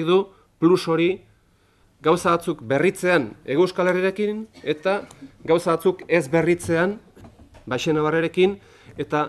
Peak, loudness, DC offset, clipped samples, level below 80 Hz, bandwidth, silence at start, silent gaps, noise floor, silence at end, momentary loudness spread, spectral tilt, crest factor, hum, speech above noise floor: -4 dBFS; -22 LUFS; under 0.1%; under 0.1%; -56 dBFS; 13 kHz; 0 s; none; -59 dBFS; 0 s; 11 LU; -6 dB/octave; 18 dB; none; 38 dB